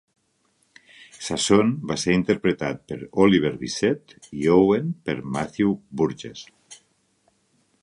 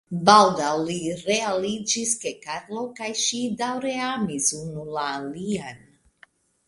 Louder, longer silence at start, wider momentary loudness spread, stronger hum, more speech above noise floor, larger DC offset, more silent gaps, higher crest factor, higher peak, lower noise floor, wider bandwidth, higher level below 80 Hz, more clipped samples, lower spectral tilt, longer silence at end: about the same, -22 LUFS vs -23 LUFS; first, 1.2 s vs 0.1 s; about the same, 16 LU vs 15 LU; neither; first, 45 dB vs 33 dB; neither; neither; about the same, 20 dB vs 24 dB; second, -4 dBFS vs 0 dBFS; first, -67 dBFS vs -57 dBFS; about the same, 11.5 kHz vs 11.5 kHz; first, -54 dBFS vs -62 dBFS; neither; first, -5.5 dB/octave vs -3 dB/octave; first, 1.1 s vs 0.9 s